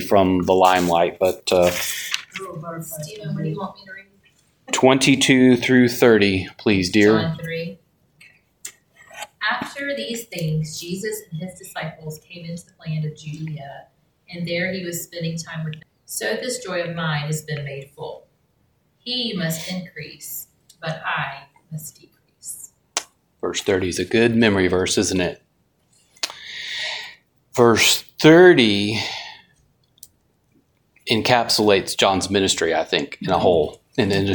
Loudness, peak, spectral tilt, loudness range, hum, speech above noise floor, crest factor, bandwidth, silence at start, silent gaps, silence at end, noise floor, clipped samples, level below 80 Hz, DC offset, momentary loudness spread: -19 LUFS; 0 dBFS; -4 dB/octave; 13 LU; none; 44 dB; 20 dB; 19.5 kHz; 0 s; none; 0 s; -64 dBFS; under 0.1%; -54 dBFS; under 0.1%; 20 LU